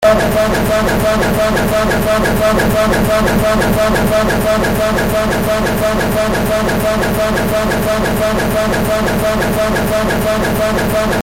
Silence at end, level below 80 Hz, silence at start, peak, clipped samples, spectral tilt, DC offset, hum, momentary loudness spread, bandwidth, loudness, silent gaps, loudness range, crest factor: 0 s; -26 dBFS; 0 s; 0 dBFS; under 0.1%; -5 dB/octave; under 0.1%; none; 2 LU; 17 kHz; -13 LUFS; none; 2 LU; 12 dB